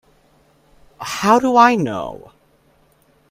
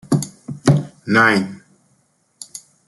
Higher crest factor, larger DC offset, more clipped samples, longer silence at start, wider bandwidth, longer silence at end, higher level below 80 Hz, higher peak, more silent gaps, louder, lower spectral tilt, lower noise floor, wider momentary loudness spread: about the same, 20 dB vs 18 dB; neither; neither; first, 1 s vs 0.1 s; first, 16 kHz vs 12 kHz; first, 1.15 s vs 0.3 s; about the same, -56 dBFS vs -54 dBFS; about the same, 0 dBFS vs -2 dBFS; neither; about the same, -15 LUFS vs -17 LUFS; about the same, -5 dB/octave vs -5.5 dB/octave; second, -56 dBFS vs -62 dBFS; about the same, 20 LU vs 21 LU